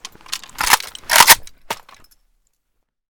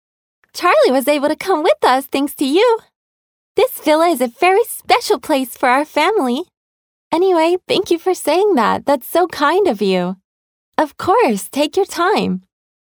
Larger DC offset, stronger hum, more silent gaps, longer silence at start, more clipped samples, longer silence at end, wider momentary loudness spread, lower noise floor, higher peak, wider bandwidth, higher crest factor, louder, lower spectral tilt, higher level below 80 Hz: neither; neither; second, none vs 2.96-3.55 s, 6.57-7.11 s, 10.24-10.72 s; second, 0.3 s vs 0.55 s; first, 0.3% vs under 0.1%; first, 1.4 s vs 0.5 s; first, 22 LU vs 7 LU; second, -70 dBFS vs under -90 dBFS; about the same, 0 dBFS vs 0 dBFS; about the same, over 20 kHz vs over 20 kHz; about the same, 18 dB vs 16 dB; first, -12 LUFS vs -16 LUFS; second, 1.5 dB/octave vs -4 dB/octave; first, -46 dBFS vs -60 dBFS